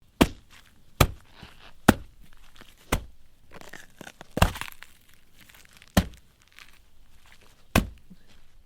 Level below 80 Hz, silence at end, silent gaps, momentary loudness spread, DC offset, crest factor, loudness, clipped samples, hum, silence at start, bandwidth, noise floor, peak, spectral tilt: -38 dBFS; 0.75 s; none; 25 LU; under 0.1%; 30 dB; -27 LUFS; under 0.1%; none; 0.2 s; 18.5 kHz; -53 dBFS; 0 dBFS; -5 dB/octave